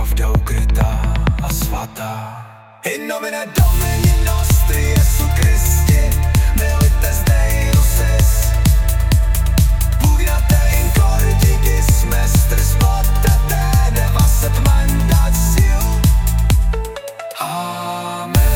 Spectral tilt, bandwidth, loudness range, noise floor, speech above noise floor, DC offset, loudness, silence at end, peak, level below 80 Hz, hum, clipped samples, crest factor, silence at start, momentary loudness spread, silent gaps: -5 dB/octave; 19 kHz; 4 LU; -36 dBFS; 22 dB; under 0.1%; -16 LUFS; 0 s; -2 dBFS; -14 dBFS; none; under 0.1%; 12 dB; 0 s; 9 LU; none